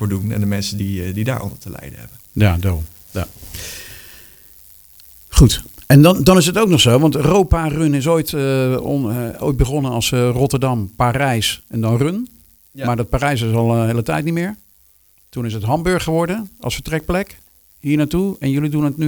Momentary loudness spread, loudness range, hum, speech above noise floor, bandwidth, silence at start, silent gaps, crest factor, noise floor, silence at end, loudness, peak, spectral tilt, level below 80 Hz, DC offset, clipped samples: 17 LU; 9 LU; none; 37 dB; over 20 kHz; 0 s; none; 16 dB; -53 dBFS; 0 s; -17 LUFS; 0 dBFS; -5.5 dB/octave; -30 dBFS; under 0.1%; under 0.1%